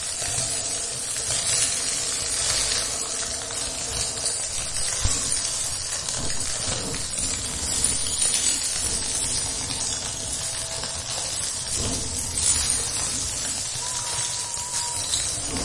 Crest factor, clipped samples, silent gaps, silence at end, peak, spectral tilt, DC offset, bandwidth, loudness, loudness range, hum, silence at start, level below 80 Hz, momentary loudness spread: 20 dB; under 0.1%; none; 0 s; -6 dBFS; -0.5 dB/octave; under 0.1%; 11.5 kHz; -23 LUFS; 2 LU; none; 0 s; -42 dBFS; 6 LU